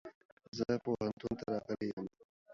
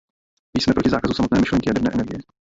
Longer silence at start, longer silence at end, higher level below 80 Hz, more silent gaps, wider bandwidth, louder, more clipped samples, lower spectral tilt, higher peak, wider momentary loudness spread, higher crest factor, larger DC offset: second, 0.05 s vs 0.55 s; second, 0 s vs 0.2 s; second, -66 dBFS vs -40 dBFS; first, 0.15-0.37 s, 0.48-0.52 s, 1.93-1.97 s, 2.25-2.46 s vs none; about the same, 7.4 kHz vs 7.8 kHz; second, -39 LUFS vs -20 LUFS; neither; about the same, -6 dB/octave vs -6 dB/octave; second, -20 dBFS vs -4 dBFS; first, 13 LU vs 8 LU; about the same, 20 dB vs 16 dB; neither